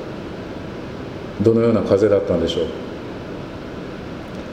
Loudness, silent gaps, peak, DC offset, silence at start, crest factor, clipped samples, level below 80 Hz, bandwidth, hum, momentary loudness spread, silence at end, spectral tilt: -21 LUFS; none; -2 dBFS; under 0.1%; 0 s; 20 dB; under 0.1%; -44 dBFS; 9.8 kHz; none; 16 LU; 0 s; -7 dB/octave